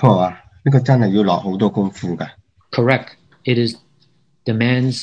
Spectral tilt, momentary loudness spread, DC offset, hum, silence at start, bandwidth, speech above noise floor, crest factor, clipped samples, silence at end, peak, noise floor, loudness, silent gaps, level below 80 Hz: -7.5 dB/octave; 13 LU; under 0.1%; none; 0 s; 9.4 kHz; 43 dB; 18 dB; under 0.1%; 0 s; 0 dBFS; -59 dBFS; -18 LUFS; none; -58 dBFS